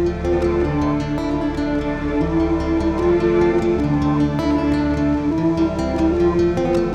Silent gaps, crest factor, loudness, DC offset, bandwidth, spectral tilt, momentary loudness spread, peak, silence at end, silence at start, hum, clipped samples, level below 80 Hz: none; 12 dB; -19 LUFS; under 0.1%; 8.8 kHz; -8 dB/octave; 5 LU; -6 dBFS; 0 s; 0 s; none; under 0.1%; -30 dBFS